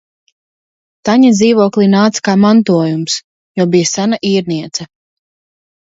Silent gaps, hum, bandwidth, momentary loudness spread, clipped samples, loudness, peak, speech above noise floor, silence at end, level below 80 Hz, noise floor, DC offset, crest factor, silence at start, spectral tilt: 3.24-3.55 s; none; 8 kHz; 11 LU; under 0.1%; -12 LUFS; 0 dBFS; over 79 dB; 1.1 s; -56 dBFS; under -90 dBFS; under 0.1%; 12 dB; 1.05 s; -5 dB/octave